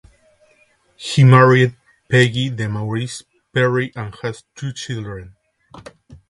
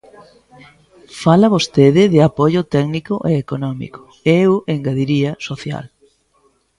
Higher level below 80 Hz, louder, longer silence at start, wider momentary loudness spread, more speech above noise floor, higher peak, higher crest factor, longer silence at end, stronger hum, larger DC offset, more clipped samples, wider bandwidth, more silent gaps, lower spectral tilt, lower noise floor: about the same, -52 dBFS vs -50 dBFS; about the same, -17 LUFS vs -15 LUFS; second, 1 s vs 1.15 s; first, 19 LU vs 14 LU; about the same, 41 dB vs 43 dB; about the same, 0 dBFS vs 0 dBFS; about the same, 18 dB vs 16 dB; second, 0.15 s vs 0.9 s; neither; neither; neither; about the same, 11.5 kHz vs 11.5 kHz; neither; about the same, -6 dB/octave vs -7 dB/octave; about the same, -57 dBFS vs -59 dBFS